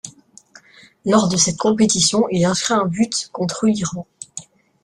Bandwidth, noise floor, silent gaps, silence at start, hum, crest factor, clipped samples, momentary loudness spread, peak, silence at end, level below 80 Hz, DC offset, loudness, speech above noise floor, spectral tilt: 12 kHz; -48 dBFS; none; 0.05 s; none; 18 dB; under 0.1%; 19 LU; -2 dBFS; 0.4 s; -54 dBFS; under 0.1%; -18 LUFS; 30 dB; -4 dB/octave